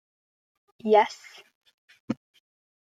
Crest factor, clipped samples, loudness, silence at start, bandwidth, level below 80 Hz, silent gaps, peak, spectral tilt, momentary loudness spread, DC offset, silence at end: 22 dB; under 0.1%; -25 LUFS; 0.85 s; 7.8 kHz; -80 dBFS; 1.55-1.61 s, 1.74-1.88 s, 2.00-2.08 s; -6 dBFS; -5 dB/octave; 15 LU; under 0.1%; 0.7 s